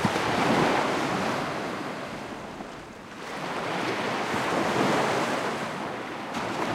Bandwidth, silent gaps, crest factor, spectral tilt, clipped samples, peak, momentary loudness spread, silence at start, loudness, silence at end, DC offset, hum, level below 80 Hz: 16.5 kHz; none; 18 dB; -4.5 dB/octave; under 0.1%; -10 dBFS; 14 LU; 0 s; -28 LUFS; 0 s; under 0.1%; none; -60 dBFS